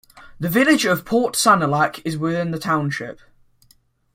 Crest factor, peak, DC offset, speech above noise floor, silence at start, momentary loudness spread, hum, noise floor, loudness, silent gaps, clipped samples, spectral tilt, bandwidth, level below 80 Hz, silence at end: 18 dB; -2 dBFS; under 0.1%; 39 dB; 0.15 s; 11 LU; none; -58 dBFS; -19 LUFS; none; under 0.1%; -4.5 dB/octave; 16.5 kHz; -56 dBFS; 1 s